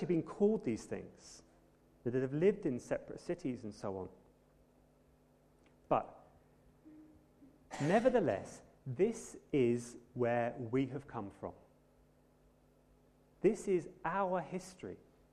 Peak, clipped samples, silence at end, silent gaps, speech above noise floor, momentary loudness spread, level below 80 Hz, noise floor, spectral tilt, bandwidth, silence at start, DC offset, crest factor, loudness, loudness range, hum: -18 dBFS; under 0.1%; 0.35 s; none; 32 dB; 17 LU; -68 dBFS; -68 dBFS; -7 dB/octave; 12 kHz; 0 s; under 0.1%; 20 dB; -37 LUFS; 9 LU; none